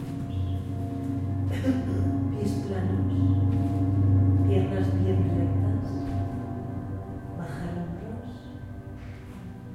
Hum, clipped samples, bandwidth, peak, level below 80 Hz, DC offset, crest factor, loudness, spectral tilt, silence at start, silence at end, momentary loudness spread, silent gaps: none; under 0.1%; 7.2 kHz; -12 dBFS; -46 dBFS; under 0.1%; 16 dB; -27 LUFS; -9 dB/octave; 0 s; 0 s; 17 LU; none